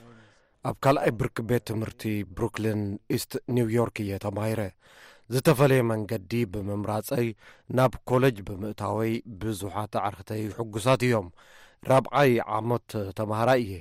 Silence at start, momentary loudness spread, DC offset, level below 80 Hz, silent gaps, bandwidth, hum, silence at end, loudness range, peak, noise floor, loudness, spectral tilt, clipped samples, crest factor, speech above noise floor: 0.05 s; 10 LU; under 0.1%; -54 dBFS; none; 16 kHz; none; 0 s; 3 LU; -10 dBFS; -57 dBFS; -27 LUFS; -6.5 dB/octave; under 0.1%; 16 dB; 31 dB